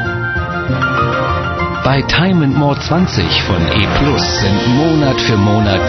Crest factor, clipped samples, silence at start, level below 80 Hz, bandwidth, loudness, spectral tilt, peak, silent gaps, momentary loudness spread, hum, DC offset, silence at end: 12 dB; under 0.1%; 0 s; -28 dBFS; 6.4 kHz; -13 LUFS; -4.5 dB/octave; 0 dBFS; none; 5 LU; none; under 0.1%; 0 s